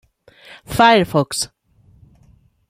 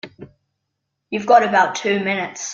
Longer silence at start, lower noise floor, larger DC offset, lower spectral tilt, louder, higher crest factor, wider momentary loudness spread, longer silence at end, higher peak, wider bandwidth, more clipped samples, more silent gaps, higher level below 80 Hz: first, 0.7 s vs 0.05 s; second, -53 dBFS vs -77 dBFS; neither; about the same, -4 dB/octave vs -3.5 dB/octave; about the same, -16 LUFS vs -17 LUFS; about the same, 18 dB vs 18 dB; about the same, 13 LU vs 14 LU; first, 1.25 s vs 0 s; about the same, 0 dBFS vs -2 dBFS; first, 16 kHz vs 7.4 kHz; neither; neither; first, -48 dBFS vs -64 dBFS